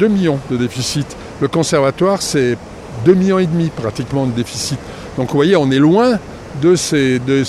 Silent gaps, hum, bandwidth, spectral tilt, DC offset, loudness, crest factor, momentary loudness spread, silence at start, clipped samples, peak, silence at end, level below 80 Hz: none; none; 14.5 kHz; -5.5 dB/octave; under 0.1%; -15 LUFS; 14 dB; 11 LU; 0 s; under 0.1%; 0 dBFS; 0 s; -42 dBFS